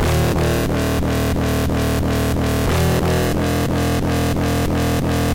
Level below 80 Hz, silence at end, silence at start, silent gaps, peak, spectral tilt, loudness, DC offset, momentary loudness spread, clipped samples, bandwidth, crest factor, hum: -26 dBFS; 0 s; 0 s; none; -8 dBFS; -6 dB/octave; -19 LUFS; under 0.1%; 2 LU; under 0.1%; 17 kHz; 8 dB; none